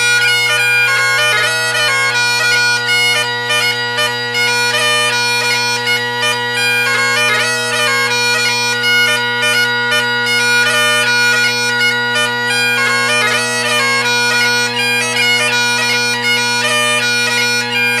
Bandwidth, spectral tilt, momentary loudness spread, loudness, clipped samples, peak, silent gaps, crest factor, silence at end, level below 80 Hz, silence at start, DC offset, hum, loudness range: 16 kHz; -1 dB/octave; 3 LU; -11 LUFS; under 0.1%; -2 dBFS; none; 12 dB; 0 s; -66 dBFS; 0 s; under 0.1%; none; 1 LU